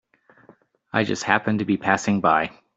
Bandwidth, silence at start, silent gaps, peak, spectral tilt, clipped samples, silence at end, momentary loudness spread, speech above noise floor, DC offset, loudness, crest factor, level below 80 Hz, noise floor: 8 kHz; 0.95 s; none; -4 dBFS; -5 dB/octave; under 0.1%; 0.25 s; 5 LU; 34 dB; under 0.1%; -22 LUFS; 20 dB; -62 dBFS; -55 dBFS